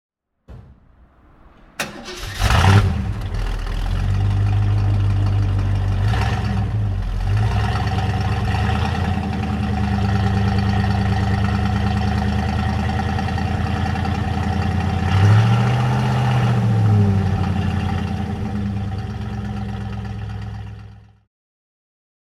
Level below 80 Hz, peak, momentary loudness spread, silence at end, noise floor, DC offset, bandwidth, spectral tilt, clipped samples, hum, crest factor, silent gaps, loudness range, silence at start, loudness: -28 dBFS; 0 dBFS; 11 LU; 1.35 s; -50 dBFS; under 0.1%; 12 kHz; -7 dB/octave; under 0.1%; none; 18 dB; none; 7 LU; 0.5 s; -20 LUFS